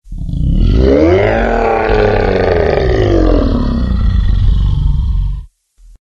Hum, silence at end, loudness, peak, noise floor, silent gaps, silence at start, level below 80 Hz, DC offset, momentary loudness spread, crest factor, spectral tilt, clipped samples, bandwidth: none; 0.55 s; -13 LUFS; 0 dBFS; -42 dBFS; none; 0.05 s; -14 dBFS; under 0.1%; 8 LU; 10 dB; -8.5 dB/octave; under 0.1%; 6.8 kHz